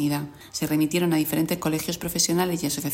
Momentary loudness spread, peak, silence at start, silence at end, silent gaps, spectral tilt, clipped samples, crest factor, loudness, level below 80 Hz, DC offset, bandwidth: 7 LU; -10 dBFS; 0 s; 0 s; none; -4 dB/octave; under 0.1%; 16 dB; -24 LUFS; -54 dBFS; under 0.1%; 16.5 kHz